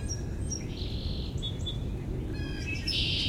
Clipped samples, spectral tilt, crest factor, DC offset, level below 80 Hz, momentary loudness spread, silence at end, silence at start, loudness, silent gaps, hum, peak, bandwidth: under 0.1%; -4 dB/octave; 14 dB; under 0.1%; -38 dBFS; 7 LU; 0 s; 0 s; -34 LUFS; none; none; -18 dBFS; 16.5 kHz